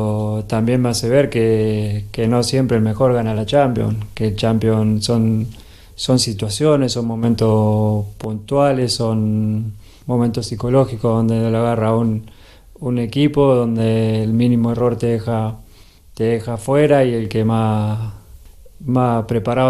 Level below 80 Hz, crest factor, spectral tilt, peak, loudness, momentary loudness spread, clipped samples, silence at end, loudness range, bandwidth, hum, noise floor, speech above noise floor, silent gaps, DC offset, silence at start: -42 dBFS; 16 dB; -6.5 dB/octave; -2 dBFS; -17 LUFS; 7 LU; under 0.1%; 0 s; 2 LU; 13 kHz; none; -44 dBFS; 28 dB; none; under 0.1%; 0 s